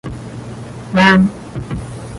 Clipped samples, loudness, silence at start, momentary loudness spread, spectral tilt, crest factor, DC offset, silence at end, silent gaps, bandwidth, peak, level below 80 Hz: under 0.1%; -14 LUFS; 0.05 s; 20 LU; -6 dB/octave; 16 dB; under 0.1%; 0 s; none; 11.5 kHz; 0 dBFS; -38 dBFS